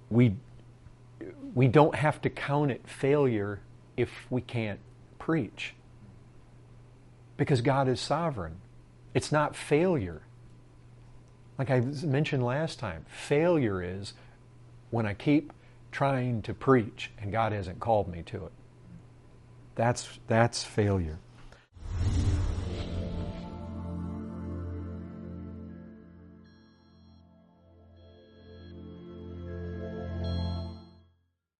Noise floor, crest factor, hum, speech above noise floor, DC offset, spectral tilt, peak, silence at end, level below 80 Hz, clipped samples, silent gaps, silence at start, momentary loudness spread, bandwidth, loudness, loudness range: -72 dBFS; 24 dB; none; 44 dB; under 0.1%; -6.5 dB/octave; -8 dBFS; 0.7 s; -48 dBFS; under 0.1%; none; 0 s; 19 LU; 11.5 kHz; -30 LUFS; 14 LU